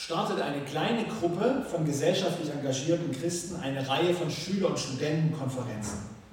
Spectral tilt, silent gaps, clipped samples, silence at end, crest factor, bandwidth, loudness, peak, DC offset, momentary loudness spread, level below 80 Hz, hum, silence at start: -5 dB/octave; none; under 0.1%; 0 s; 16 dB; 17 kHz; -30 LUFS; -12 dBFS; under 0.1%; 7 LU; -60 dBFS; none; 0 s